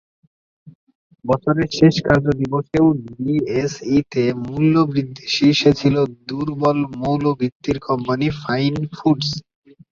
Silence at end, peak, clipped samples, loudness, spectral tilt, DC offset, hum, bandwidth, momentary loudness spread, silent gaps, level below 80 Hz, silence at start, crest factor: 0.5 s; -2 dBFS; under 0.1%; -19 LUFS; -6.5 dB/octave; under 0.1%; none; 7.4 kHz; 8 LU; 0.75-0.87 s, 0.95-1.10 s, 7.52-7.60 s; -48 dBFS; 0.65 s; 18 dB